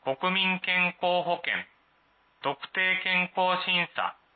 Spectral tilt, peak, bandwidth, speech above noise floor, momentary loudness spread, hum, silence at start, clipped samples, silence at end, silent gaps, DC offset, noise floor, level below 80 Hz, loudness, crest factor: -8 dB/octave; -12 dBFS; 4.7 kHz; 38 dB; 9 LU; none; 0.05 s; under 0.1%; 0.25 s; none; under 0.1%; -66 dBFS; -80 dBFS; -26 LUFS; 16 dB